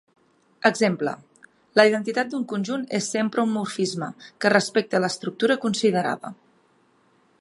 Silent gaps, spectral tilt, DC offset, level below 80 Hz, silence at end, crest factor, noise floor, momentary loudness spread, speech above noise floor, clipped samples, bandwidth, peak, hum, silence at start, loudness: none; -4.5 dB/octave; under 0.1%; -72 dBFS; 1.1 s; 24 dB; -62 dBFS; 10 LU; 39 dB; under 0.1%; 11.5 kHz; 0 dBFS; none; 0.65 s; -23 LUFS